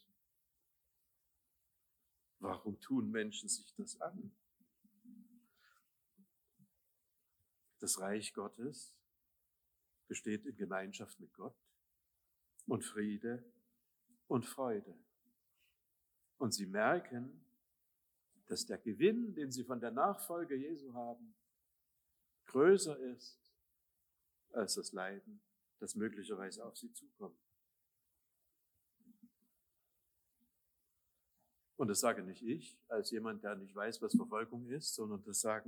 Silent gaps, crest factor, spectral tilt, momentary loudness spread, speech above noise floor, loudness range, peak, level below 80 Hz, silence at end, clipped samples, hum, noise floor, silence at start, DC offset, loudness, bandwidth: none; 26 dB; -4 dB/octave; 18 LU; 44 dB; 10 LU; -18 dBFS; under -90 dBFS; 0.05 s; under 0.1%; 60 Hz at -80 dBFS; -84 dBFS; 2.4 s; under 0.1%; -40 LUFS; over 20 kHz